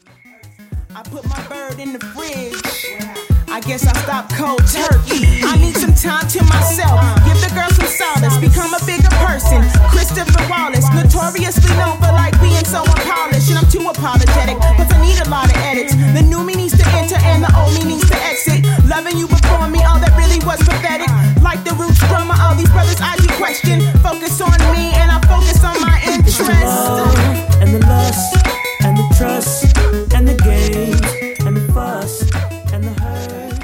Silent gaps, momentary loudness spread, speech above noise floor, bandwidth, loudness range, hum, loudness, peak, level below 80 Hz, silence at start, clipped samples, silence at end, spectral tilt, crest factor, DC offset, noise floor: none; 9 LU; 31 dB; 17 kHz; 4 LU; none; -13 LUFS; 0 dBFS; -14 dBFS; 0.45 s; under 0.1%; 0 s; -5 dB/octave; 12 dB; under 0.1%; -42 dBFS